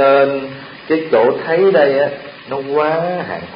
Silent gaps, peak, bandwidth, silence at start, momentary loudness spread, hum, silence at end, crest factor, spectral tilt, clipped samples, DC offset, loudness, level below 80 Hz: none; 0 dBFS; 5.2 kHz; 0 s; 14 LU; none; 0 s; 14 dB; -11 dB/octave; under 0.1%; under 0.1%; -15 LUFS; -58 dBFS